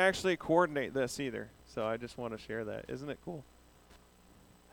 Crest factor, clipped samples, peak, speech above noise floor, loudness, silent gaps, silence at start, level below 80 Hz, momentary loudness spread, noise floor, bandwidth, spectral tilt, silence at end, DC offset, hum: 22 dB; under 0.1%; -14 dBFS; 27 dB; -35 LUFS; none; 0 s; -62 dBFS; 15 LU; -61 dBFS; over 20 kHz; -5 dB/octave; 0.75 s; under 0.1%; none